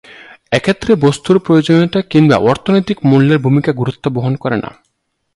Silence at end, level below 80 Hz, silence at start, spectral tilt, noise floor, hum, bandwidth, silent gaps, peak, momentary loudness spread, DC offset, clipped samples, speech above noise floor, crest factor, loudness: 0.65 s; -46 dBFS; 0.1 s; -7 dB/octave; -67 dBFS; none; 11.5 kHz; none; 0 dBFS; 8 LU; under 0.1%; under 0.1%; 55 dB; 12 dB; -13 LUFS